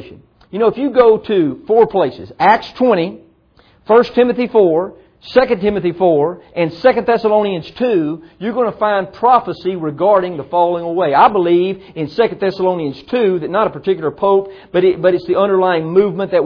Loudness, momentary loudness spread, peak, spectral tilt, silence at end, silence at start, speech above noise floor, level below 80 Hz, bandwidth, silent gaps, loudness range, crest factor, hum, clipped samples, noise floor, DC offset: -15 LUFS; 8 LU; 0 dBFS; -8.5 dB/octave; 0 s; 0 s; 37 dB; -50 dBFS; 5.4 kHz; none; 2 LU; 14 dB; none; under 0.1%; -51 dBFS; under 0.1%